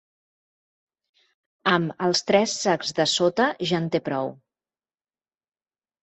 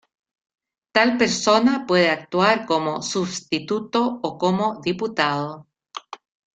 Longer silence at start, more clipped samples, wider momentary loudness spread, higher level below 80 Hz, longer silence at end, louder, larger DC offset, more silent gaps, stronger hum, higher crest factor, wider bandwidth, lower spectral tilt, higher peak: first, 1.65 s vs 0.95 s; neither; second, 7 LU vs 14 LU; second, -68 dBFS vs -62 dBFS; first, 1.7 s vs 0.4 s; about the same, -23 LUFS vs -21 LUFS; neither; neither; neither; about the same, 22 dB vs 20 dB; second, 8.4 kHz vs 9.4 kHz; about the same, -4 dB/octave vs -4 dB/octave; second, -6 dBFS vs -2 dBFS